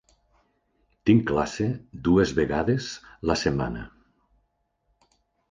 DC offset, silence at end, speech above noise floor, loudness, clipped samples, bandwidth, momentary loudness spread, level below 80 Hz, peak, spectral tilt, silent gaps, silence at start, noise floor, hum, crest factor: under 0.1%; 1.65 s; 49 dB; -25 LUFS; under 0.1%; 9.6 kHz; 11 LU; -46 dBFS; -6 dBFS; -6.5 dB/octave; none; 1.05 s; -73 dBFS; none; 20 dB